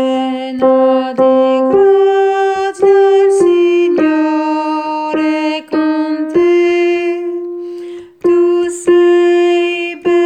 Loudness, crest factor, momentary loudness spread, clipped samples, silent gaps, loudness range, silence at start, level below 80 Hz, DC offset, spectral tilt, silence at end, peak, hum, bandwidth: -12 LUFS; 10 dB; 8 LU; under 0.1%; none; 4 LU; 0 s; -56 dBFS; under 0.1%; -4.5 dB/octave; 0 s; 0 dBFS; none; 9.6 kHz